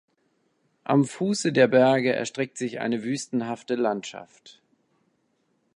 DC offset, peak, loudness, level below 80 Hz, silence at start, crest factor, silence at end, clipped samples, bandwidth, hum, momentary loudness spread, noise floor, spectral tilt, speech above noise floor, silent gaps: under 0.1%; -6 dBFS; -24 LUFS; -74 dBFS; 0.9 s; 20 dB; 1.25 s; under 0.1%; 11 kHz; none; 12 LU; -71 dBFS; -5.5 dB/octave; 47 dB; none